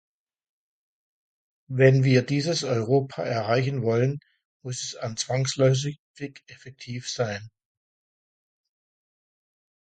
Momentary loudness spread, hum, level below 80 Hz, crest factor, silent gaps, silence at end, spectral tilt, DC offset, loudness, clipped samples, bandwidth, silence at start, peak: 18 LU; none; -64 dBFS; 24 dB; 4.45-4.60 s, 5.99-6.14 s; 2.4 s; -5.5 dB/octave; under 0.1%; -24 LUFS; under 0.1%; 9.2 kHz; 1.7 s; -4 dBFS